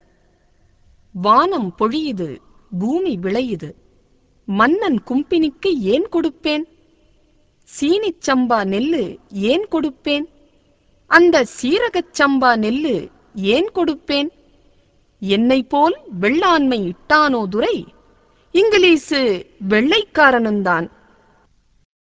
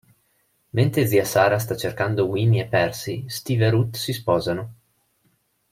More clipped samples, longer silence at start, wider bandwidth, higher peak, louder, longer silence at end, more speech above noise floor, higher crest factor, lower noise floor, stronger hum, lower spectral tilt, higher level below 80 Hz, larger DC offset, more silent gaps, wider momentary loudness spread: neither; first, 1.15 s vs 0.75 s; second, 8 kHz vs 16.5 kHz; first, 0 dBFS vs -4 dBFS; first, -17 LUFS vs -22 LUFS; first, 1.2 s vs 1 s; second, 40 dB vs 46 dB; about the same, 18 dB vs 18 dB; second, -56 dBFS vs -67 dBFS; neither; about the same, -5 dB/octave vs -6 dB/octave; about the same, -52 dBFS vs -56 dBFS; neither; neither; about the same, 12 LU vs 10 LU